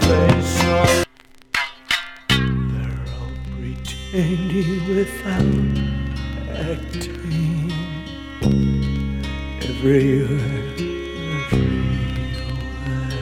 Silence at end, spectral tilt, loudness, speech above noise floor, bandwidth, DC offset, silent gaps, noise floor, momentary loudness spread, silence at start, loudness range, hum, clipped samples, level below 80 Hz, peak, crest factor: 0 s; -6 dB/octave; -21 LUFS; 28 dB; 17 kHz; under 0.1%; none; -47 dBFS; 12 LU; 0 s; 3 LU; none; under 0.1%; -30 dBFS; -2 dBFS; 20 dB